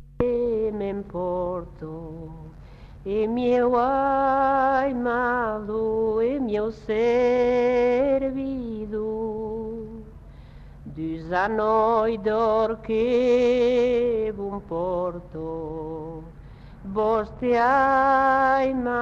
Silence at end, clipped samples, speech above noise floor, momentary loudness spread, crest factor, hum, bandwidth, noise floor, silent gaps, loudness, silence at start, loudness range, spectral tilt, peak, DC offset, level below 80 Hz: 0 s; under 0.1%; 21 dB; 15 LU; 16 dB; none; 7.2 kHz; -43 dBFS; none; -23 LUFS; 0 s; 7 LU; -7 dB/octave; -8 dBFS; under 0.1%; -46 dBFS